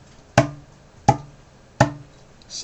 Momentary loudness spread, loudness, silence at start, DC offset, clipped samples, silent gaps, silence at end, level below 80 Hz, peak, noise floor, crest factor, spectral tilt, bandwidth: 17 LU; -22 LUFS; 0.35 s; under 0.1%; under 0.1%; none; 0 s; -46 dBFS; -2 dBFS; -49 dBFS; 24 dB; -5.5 dB/octave; 10 kHz